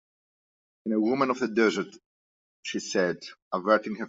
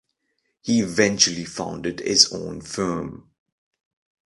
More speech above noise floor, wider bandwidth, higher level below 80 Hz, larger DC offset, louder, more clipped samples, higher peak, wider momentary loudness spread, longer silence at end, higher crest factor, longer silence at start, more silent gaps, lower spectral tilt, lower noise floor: first, over 63 dB vs 52 dB; second, 7.8 kHz vs 11.5 kHz; second, -74 dBFS vs -54 dBFS; neither; second, -27 LUFS vs -21 LUFS; neither; second, -8 dBFS vs 0 dBFS; about the same, 14 LU vs 15 LU; second, 0 s vs 1.05 s; about the same, 22 dB vs 24 dB; first, 0.85 s vs 0.65 s; first, 2.06-2.63 s, 3.42-3.51 s vs none; first, -4.5 dB/octave vs -2.5 dB/octave; first, under -90 dBFS vs -74 dBFS